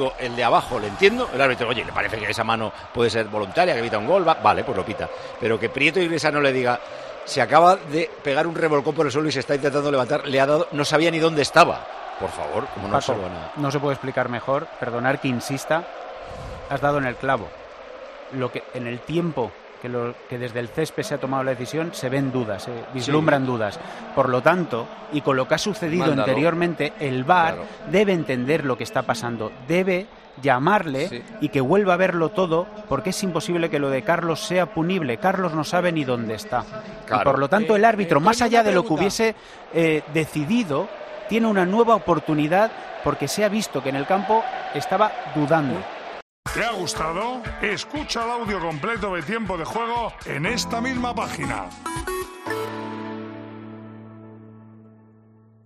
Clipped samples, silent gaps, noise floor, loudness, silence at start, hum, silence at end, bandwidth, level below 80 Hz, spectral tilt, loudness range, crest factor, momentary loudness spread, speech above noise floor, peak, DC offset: under 0.1%; 46.22-46.43 s; -52 dBFS; -22 LUFS; 0 s; none; 0.8 s; 14 kHz; -50 dBFS; -5 dB/octave; 7 LU; 22 dB; 12 LU; 31 dB; 0 dBFS; under 0.1%